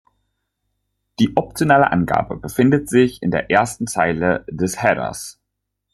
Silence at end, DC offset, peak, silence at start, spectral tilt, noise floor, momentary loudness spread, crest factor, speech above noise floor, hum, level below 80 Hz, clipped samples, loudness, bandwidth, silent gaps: 0.65 s; under 0.1%; 0 dBFS; 1.2 s; -5.5 dB/octave; -77 dBFS; 9 LU; 20 dB; 60 dB; 50 Hz at -45 dBFS; -48 dBFS; under 0.1%; -18 LUFS; 13 kHz; none